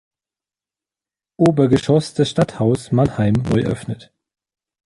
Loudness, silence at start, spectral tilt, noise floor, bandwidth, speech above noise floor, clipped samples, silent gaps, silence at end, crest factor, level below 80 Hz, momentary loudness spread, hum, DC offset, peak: -18 LUFS; 1.4 s; -7.5 dB/octave; under -90 dBFS; 11.5 kHz; over 73 dB; under 0.1%; none; 0.9 s; 16 dB; -44 dBFS; 9 LU; none; under 0.1%; -2 dBFS